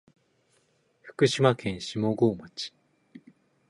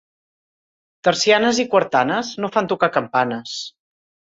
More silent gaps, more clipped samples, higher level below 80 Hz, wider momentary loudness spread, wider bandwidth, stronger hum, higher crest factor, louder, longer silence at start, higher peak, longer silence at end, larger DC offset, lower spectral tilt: neither; neither; about the same, -62 dBFS vs -64 dBFS; first, 15 LU vs 12 LU; first, 11.5 kHz vs 8 kHz; neither; first, 24 dB vs 18 dB; second, -27 LUFS vs -19 LUFS; about the same, 1.05 s vs 1.05 s; second, -6 dBFS vs -2 dBFS; second, 0.5 s vs 0.65 s; neither; first, -5.5 dB/octave vs -3.5 dB/octave